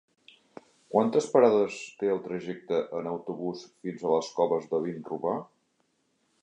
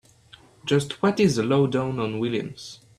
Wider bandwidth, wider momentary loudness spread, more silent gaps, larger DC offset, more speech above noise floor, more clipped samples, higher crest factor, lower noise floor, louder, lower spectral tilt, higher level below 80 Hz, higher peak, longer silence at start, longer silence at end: second, 9.6 kHz vs 13 kHz; about the same, 13 LU vs 14 LU; neither; neither; first, 45 dB vs 29 dB; neither; first, 22 dB vs 16 dB; first, -73 dBFS vs -52 dBFS; second, -28 LUFS vs -23 LUFS; about the same, -6 dB/octave vs -6 dB/octave; second, -74 dBFS vs -58 dBFS; about the same, -8 dBFS vs -8 dBFS; first, 0.9 s vs 0.65 s; first, 1 s vs 0.25 s